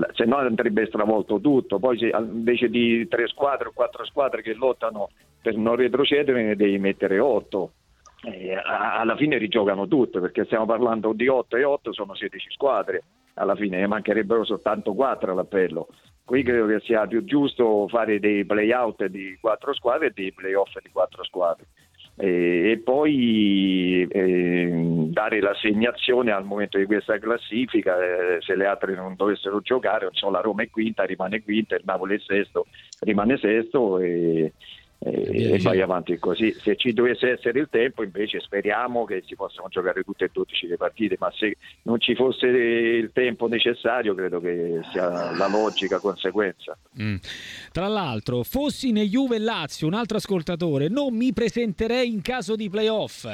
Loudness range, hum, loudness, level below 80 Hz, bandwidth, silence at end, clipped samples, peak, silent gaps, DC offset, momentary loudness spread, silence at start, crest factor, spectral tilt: 4 LU; none; -23 LUFS; -56 dBFS; 13.5 kHz; 0 s; under 0.1%; -6 dBFS; none; under 0.1%; 8 LU; 0 s; 16 dB; -6 dB/octave